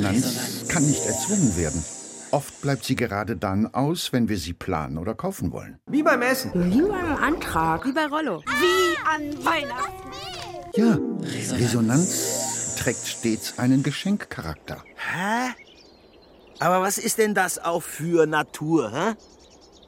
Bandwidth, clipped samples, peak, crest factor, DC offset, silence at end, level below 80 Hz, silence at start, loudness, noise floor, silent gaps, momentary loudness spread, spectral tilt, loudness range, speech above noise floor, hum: 16.5 kHz; under 0.1%; -6 dBFS; 18 dB; under 0.1%; 0.7 s; -48 dBFS; 0 s; -24 LUFS; -51 dBFS; none; 10 LU; -4.5 dB/octave; 4 LU; 28 dB; none